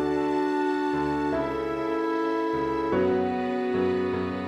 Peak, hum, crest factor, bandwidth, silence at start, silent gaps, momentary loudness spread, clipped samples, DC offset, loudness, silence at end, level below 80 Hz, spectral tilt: -14 dBFS; none; 12 dB; 9.4 kHz; 0 s; none; 3 LU; under 0.1%; under 0.1%; -26 LUFS; 0 s; -54 dBFS; -7 dB/octave